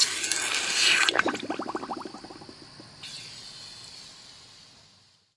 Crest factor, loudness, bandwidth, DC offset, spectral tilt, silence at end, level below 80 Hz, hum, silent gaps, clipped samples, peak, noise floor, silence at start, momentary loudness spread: 28 dB; -24 LUFS; 12 kHz; under 0.1%; 0 dB/octave; 0.7 s; -70 dBFS; none; none; under 0.1%; -2 dBFS; -60 dBFS; 0 s; 25 LU